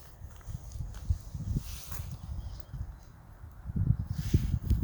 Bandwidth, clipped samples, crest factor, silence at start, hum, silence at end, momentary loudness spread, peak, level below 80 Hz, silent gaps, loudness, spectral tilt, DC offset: over 20 kHz; under 0.1%; 22 dB; 0 s; none; 0 s; 17 LU; -12 dBFS; -38 dBFS; none; -36 LUFS; -7 dB/octave; under 0.1%